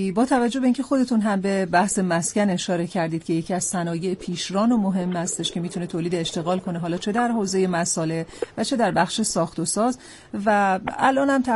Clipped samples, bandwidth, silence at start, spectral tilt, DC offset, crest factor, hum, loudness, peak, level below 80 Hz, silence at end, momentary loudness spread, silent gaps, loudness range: under 0.1%; 11.5 kHz; 0 s; -4.5 dB/octave; under 0.1%; 16 dB; none; -23 LUFS; -6 dBFS; -56 dBFS; 0 s; 7 LU; none; 2 LU